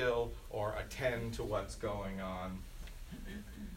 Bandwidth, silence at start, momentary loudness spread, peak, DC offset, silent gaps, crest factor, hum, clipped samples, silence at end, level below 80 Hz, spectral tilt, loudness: 16 kHz; 0 s; 13 LU; -22 dBFS; under 0.1%; none; 18 dB; none; under 0.1%; 0 s; -48 dBFS; -5.5 dB/octave; -40 LUFS